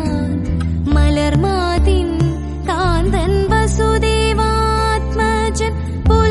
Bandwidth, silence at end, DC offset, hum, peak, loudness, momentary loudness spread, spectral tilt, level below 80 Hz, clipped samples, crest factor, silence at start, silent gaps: 11.5 kHz; 0 s; under 0.1%; none; -2 dBFS; -16 LUFS; 5 LU; -6 dB/octave; -20 dBFS; under 0.1%; 14 dB; 0 s; none